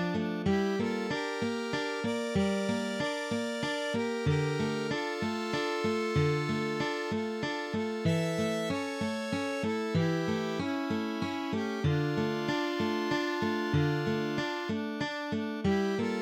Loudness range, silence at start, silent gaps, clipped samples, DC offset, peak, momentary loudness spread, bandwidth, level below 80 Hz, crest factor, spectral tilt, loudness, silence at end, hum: 1 LU; 0 s; none; under 0.1%; under 0.1%; -16 dBFS; 4 LU; 16.5 kHz; -60 dBFS; 14 dB; -6 dB/octave; -31 LUFS; 0 s; none